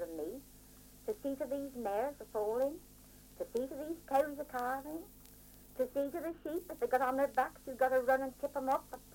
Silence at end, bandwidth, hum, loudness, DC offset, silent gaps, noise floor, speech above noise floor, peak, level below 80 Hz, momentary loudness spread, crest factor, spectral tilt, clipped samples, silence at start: 0 s; 17 kHz; 50 Hz at -65 dBFS; -37 LUFS; under 0.1%; none; -58 dBFS; 22 dB; -18 dBFS; -64 dBFS; 19 LU; 20 dB; -5 dB/octave; under 0.1%; 0 s